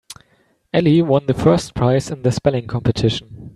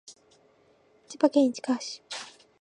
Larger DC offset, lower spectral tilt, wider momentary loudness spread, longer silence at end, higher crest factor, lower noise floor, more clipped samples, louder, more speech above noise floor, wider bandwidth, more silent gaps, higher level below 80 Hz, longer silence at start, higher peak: neither; first, -7 dB/octave vs -3 dB/octave; second, 6 LU vs 20 LU; second, 0.05 s vs 0.3 s; second, 16 dB vs 22 dB; about the same, -60 dBFS vs -63 dBFS; neither; first, -17 LUFS vs -27 LUFS; first, 43 dB vs 37 dB; first, 12.5 kHz vs 10.5 kHz; neither; first, -42 dBFS vs -84 dBFS; about the same, 0.1 s vs 0.1 s; first, -2 dBFS vs -8 dBFS